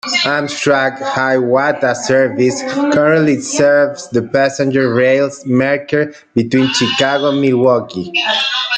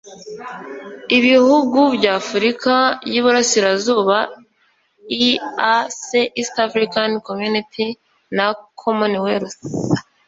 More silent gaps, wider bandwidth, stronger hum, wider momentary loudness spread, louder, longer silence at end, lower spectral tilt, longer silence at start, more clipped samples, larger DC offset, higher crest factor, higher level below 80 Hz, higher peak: neither; first, 9.4 kHz vs 7.8 kHz; neither; second, 5 LU vs 13 LU; first, -13 LUFS vs -17 LUFS; second, 0 s vs 0.25 s; about the same, -4.5 dB/octave vs -3.5 dB/octave; about the same, 0.05 s vs 0.05 s; neither; neither; about the same, 12 dB vs 16 dB; about the same, -56 dBFS vs -60 dBFS; about the same, -2 dBFS vs -2 dBFS